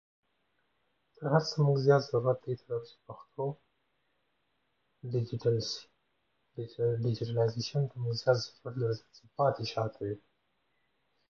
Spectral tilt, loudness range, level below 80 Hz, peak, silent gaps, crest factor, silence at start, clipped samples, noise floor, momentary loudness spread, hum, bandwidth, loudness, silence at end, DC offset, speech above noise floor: -6.5 dB/octave; 7 LU; -70 dBFS; -12 dBFS; none; 22 dB; 1.2 s; under 0.1%; -78 dBFS; 17 LU; none; 7.2 kHz; -32 LUFS; 1.15 s; under 0.1%; 47 dB